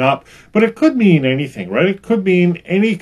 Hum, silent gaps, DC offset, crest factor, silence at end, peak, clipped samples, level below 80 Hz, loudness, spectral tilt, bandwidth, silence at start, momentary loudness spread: none; none; under 0.1%; 14 dB; 0 s; 0 dBFS; under 0.1%; -54 dBFS; -15 LUFS; -8 dB/octave; 11 kHz; 0 s; 8 LU